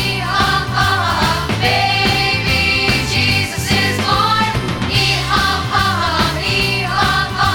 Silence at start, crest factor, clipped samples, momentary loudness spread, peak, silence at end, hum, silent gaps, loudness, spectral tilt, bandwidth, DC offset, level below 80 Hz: 0 s; 14 dB; under 0.1%; 3 LU; -2 dBFS; 0 s; none; none; -14 LUFS; -4 dB/octave; over 20 kHz; 0.2%; -30 dBFS